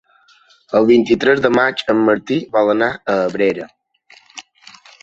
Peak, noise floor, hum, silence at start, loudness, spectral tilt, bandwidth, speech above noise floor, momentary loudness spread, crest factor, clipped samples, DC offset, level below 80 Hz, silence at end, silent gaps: -2 dBFS; -52 dBFS; none; 0.7 s; -15 LUFS; -6 dB/octave; 7.8 kHz; 37 dB; 23 LU; 16 dB; under 0.1%; under 0.1%; -56 dBFS; 0.6 s; none